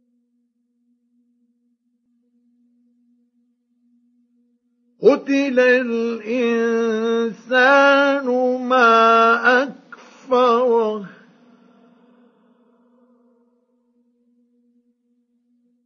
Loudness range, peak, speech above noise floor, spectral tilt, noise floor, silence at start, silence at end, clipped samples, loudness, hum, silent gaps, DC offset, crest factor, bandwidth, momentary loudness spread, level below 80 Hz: 9 LU; -2 dBFS; 52 dB; -4.5 dB/octave; -68 dBFS; 5 s; 4.8 s; under 0.1%; -16 LUFS; none; none; under 0.1%; 20 dB; 6.8 kHz; 10 LU; -84 dBFS